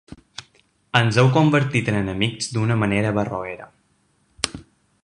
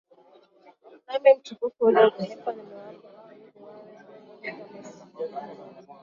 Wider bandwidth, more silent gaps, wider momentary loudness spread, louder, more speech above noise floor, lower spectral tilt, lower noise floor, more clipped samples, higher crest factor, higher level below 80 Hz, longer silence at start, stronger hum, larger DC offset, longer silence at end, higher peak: first, 11.5 kHz vs 7.2 kHz; neither; second, 22 LU vs 26 LU; first, -20 LUFS vs -24 LUFS; first, 44 dB vs 34 dB; about the same, -5.5 dB/octave vs -6 dB/octave; first, -64 dBFS vs -57 dBFS; neither; about the same, 20 dB vs 22 dB; first, -50 dBFS vs -76 dBFS; second, 0.4 s vs 1.1 s; neither; neither; about the same, 0.4 s vs 0.4 s; first, -2 dBFS vs -6 dBFS